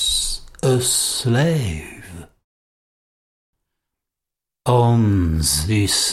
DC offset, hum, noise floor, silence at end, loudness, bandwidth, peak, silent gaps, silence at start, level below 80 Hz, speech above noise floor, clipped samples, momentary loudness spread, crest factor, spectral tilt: under 0.1%; none; -86 dBFS; 0 s; -18 LUFS; 15.5 kHz; -4 dBFS; 2.44-3.53 s; 0 s; -36 dBFS; 69 dB; under 0.1%; 14 LU; 18 dB; -4 dB/octave